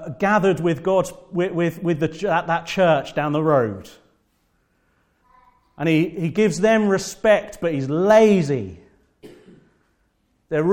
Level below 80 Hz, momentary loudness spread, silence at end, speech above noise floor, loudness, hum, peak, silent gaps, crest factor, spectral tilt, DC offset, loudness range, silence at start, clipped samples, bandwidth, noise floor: -54 dBFS; 9 LU; 0 s; 47 dB; -20 LUFS; none; -4 dBFS; none; 18 dB; -6 dB/octave; under 0.1%; 6 LU; 0 s; under 0.1%; 17 kHz; -66 dBFS